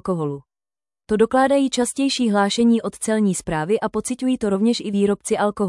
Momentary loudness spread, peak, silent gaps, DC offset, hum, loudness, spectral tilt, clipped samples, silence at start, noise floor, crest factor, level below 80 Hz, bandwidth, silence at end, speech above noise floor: 7 LU; -6 dBFS; none; under 0.1%; none; -20 LUFS; -5 dB/octave; under 0.1%; 0.05 s; under -90 dBFS; 14 dB; -52 dBFS; 12 kHz; 0 s; over 71 dB